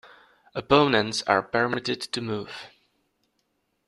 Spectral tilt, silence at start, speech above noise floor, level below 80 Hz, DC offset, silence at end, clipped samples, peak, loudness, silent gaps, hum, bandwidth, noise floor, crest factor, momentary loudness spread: -4.5 dB/octave; 0.55 s; 50 dB; -58 dBFS; under 0.1%; 1.2 s; under 0.1%; -4 dBFS; -24 LUFS; none; none; 12 kHz; -74 dBFS; 24 dB; 17 LU